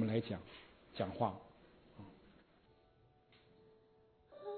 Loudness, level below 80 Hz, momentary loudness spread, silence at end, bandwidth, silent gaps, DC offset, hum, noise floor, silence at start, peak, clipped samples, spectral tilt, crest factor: -42 LUFS; -74 dBFS; 26 LU; 0 s; 4.5 kHz; none; under 0.1%; none; -70 dBFS; 0 s; -22 dBFS; under 0.1%; -6 dB/octave; 22 dB